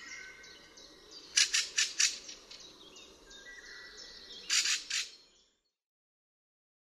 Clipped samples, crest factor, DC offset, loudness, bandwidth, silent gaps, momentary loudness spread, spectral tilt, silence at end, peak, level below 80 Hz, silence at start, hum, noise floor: under 0.1%; 28 dB; under 0.1%; -30 LUFS; 15 kHz; none; 24 LU; 3.5 dB/octave; 1.8 s; -10 dBFS; -72 dBFS; 0 s; none; -73 dBFS